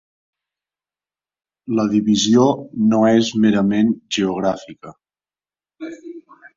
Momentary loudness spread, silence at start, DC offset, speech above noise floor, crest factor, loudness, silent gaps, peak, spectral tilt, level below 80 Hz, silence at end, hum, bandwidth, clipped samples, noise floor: 21 LU; 1.7 s; under 0.1%; over 73 dB; 18 dB; -17 LUFS; none; -2 dBFS; -5.5 dB/octave; -58 dBFS; 0.35 s; none; 7.6 kHz; under 0.1%; under -90 dBFS